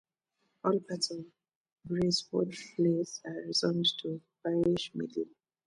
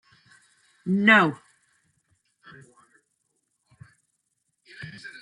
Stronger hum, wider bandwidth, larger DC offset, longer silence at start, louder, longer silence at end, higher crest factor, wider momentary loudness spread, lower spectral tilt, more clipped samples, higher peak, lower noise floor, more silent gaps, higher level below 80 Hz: neither; about the same, 11 kHz vs 11 kHz; neither; second, 0.65 s vs 0.85 s; second, -32 LUFS vs -19 LUFS; first, 0.4 s vs 0.1 s; second, 18 dB vs 24 dB; second, 10 LU vs 25 LU; about the same, -5 dB/octave vs -6 dB/octave; neither; second, -16 dBFS vs -4 dBFS; first, -80 dBFS vs -76 dBFS; first, 1.55-1.64 s, 1.72-1.76 s vs none; first, -66 dBFS vs -76 dBFS